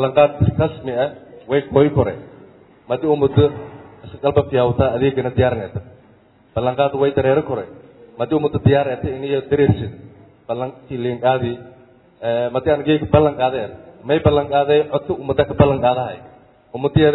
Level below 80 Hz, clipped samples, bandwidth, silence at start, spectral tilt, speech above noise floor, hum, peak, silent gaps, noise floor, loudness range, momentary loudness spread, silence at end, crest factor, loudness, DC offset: -42 dBFS; under 0.1%; 4.1 kHz; 0 s; -11 dB/octave; 34 dB; none; 0 dBFS; none; -51 dBFS; 3 LU; 13 LU; 0 s; 18 dB; -18 LUFS; under 0.1%